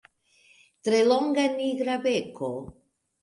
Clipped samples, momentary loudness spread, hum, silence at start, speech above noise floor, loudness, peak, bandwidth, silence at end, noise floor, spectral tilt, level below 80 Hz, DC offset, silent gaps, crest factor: under 0.1%; 12 LU; none; 0.85 s; 37 dB; -26 LUFS; -10 dBFS; 11.5 kHz; 0.5 s; -61 dBFS; -4.5 dB/octave; -64 dBFS; under 0.1%; none; 18 dB